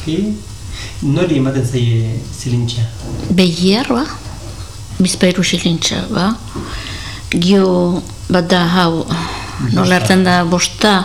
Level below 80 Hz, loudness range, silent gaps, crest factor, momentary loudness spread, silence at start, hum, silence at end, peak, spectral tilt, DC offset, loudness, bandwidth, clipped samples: -34 dBFS; 3 LU; none; 14 dB; 14 LU; 0 s; none; 0 s; 0 dBFS; -5 dB/octave; 1%; -15 LUFS; 14.5 kHz; under 0.1%